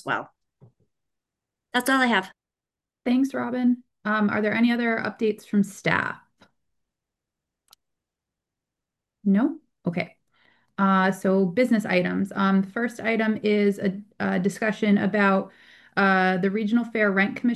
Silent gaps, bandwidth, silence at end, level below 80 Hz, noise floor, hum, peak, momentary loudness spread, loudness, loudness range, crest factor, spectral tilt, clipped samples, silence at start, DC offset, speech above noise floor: none; 12.5 kHz; 0 s; -68 dBFS; -90 dBFS; none; -6 dBFS; 9 LU; -23 LUFS; 8 LU; 20 dB; -6.5 dB/octave; under 0.1%; 0.05 s; under 0.1%; 67 dB